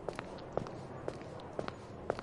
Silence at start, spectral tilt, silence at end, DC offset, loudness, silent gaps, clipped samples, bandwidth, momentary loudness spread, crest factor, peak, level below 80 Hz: 0 s; -6.5 dB/octave; 0 s; under 0.1%; -44 LUFS; none; under 0.1%; 11.5 kHz; 4 LU; 26 dB; -18 dBFS; -60 dBFS